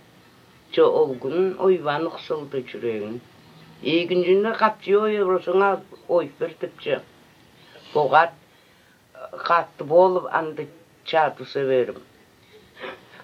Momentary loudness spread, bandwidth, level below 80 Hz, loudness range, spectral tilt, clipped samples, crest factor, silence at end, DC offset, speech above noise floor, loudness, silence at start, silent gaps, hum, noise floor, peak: 17 LU; 6.8 kHz; -72 dBFS; 3 LU; -7 dB/octave; under 0.1%; 22 dB; 0.3 s; under 0.1%; 34 dB; -22 LUFS; 0.7 s; none; none; -56 dBFS; -2 dBFS